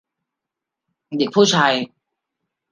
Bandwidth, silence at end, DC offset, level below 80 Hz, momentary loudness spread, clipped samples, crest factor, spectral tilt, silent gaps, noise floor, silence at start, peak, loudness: 10 kHz; 0.85 s; under 0.1%; -68 dBFS; 16 LU; under 0.1%; 20 dB; -4 dB/octave; none; -84 dBFS; 1.1 s; -2 dBFS; -17 LUFS